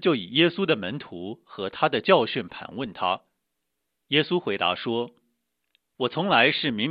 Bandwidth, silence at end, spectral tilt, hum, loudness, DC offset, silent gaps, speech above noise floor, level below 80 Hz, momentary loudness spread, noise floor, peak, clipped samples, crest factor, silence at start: 5.2 kHz; 0 s; -8.5 dB/octave; none; -24 LUFS; under 0.1%; none; 56 dB; -68 dBFS; 15 LU; -81 dBFS; -4 dBFS; under 0.1%; 22 dB; 0 s